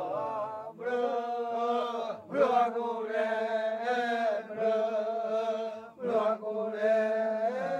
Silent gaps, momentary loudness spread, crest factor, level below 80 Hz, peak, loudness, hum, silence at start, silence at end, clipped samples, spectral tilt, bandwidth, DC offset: none; 7 LU; 18 dB; -84 dBFS; -12 dBFS; -31 LUFS; none; 0 s; 0 s; under 0.1%; -5.5 dB/octave; 9.2 kHz; under 0.1%